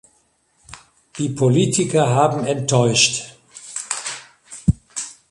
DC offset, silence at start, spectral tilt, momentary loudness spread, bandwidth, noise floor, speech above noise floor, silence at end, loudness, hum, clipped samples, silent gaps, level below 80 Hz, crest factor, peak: under 0.1%; 0.7 s; -4 dB/octave; 19 LU; 11.5 kHz; -62 dBFS; 45 dB; 0.2 s; -19 LUFS; none; under 0.1%; none; -42 dBFS; 20 dB; -2 dBFS